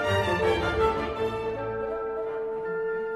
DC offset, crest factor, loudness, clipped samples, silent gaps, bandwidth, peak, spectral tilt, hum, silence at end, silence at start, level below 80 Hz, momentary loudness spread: under 0.1%; 16 dB; -28 LUFS; under 0.1%; none; 13.5 kHz; -12 dBFS; -6 dB/octave; none; 0 s; 0 s; -44 dBFS; 7 LU